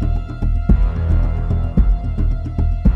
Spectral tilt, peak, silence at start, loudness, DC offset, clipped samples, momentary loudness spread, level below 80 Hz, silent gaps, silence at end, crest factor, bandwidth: -10.5 dB/octave; -2 dBFS; 0 s; -19 LUFS; under 0.1%; under 0.1%; 5 LU; -16 dBFS; none; 0 s; 14 dB; 4.2 kHz